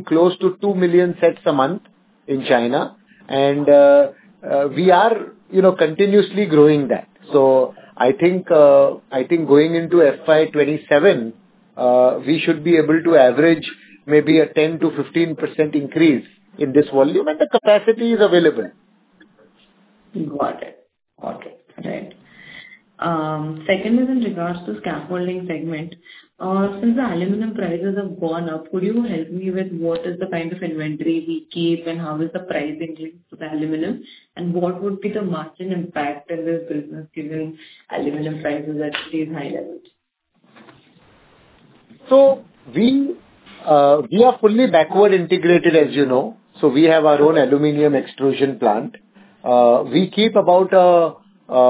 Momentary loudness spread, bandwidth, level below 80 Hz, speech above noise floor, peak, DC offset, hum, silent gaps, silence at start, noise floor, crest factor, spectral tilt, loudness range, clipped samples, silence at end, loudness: 16 LU; 4 kHz; -64 dBFS; 51 dB; 0 dBFS; under 0.1%; none; none; 0 s; -68 dBFS; 16 dB; -10.5 dB/octave; 11 LU; under 0.1%; 0 s; -17 LUFS